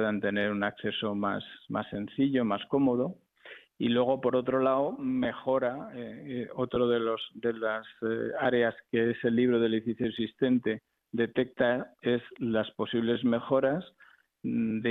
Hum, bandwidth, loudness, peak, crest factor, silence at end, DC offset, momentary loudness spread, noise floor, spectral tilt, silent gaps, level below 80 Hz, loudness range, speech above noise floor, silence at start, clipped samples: none; 4.1 kHz; -30 LUFS; -14 dBFS; 16 dB; 0 s; under 0.1%; 9 LU; -52 dBFS; -9 dB/octave; none; -66 dBFS; 2 LU; 23 dB; 0 s; under 0.1%